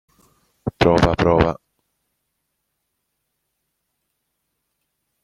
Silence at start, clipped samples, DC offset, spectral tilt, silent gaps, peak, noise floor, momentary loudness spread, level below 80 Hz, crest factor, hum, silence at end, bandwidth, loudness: 0.65 s; under 0.1%; under 0.1%; -7 dB/octave; none; -2 dBFS; -75 dBFS; 16 LU; -40 dBFS; 22 dB; none; 3.7 s; 11.5 kHz; -17 LUFS